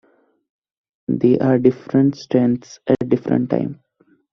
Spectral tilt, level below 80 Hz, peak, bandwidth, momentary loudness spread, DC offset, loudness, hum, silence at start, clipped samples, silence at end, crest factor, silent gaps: -8.5 dB/octave; -58 dBFS; -2 dBFS; 6.4 kHz; 9 LU; under 0.1%; -18 LUFS; none; 1.1 s; under 0.1%; 0.6 s; 18 dB; none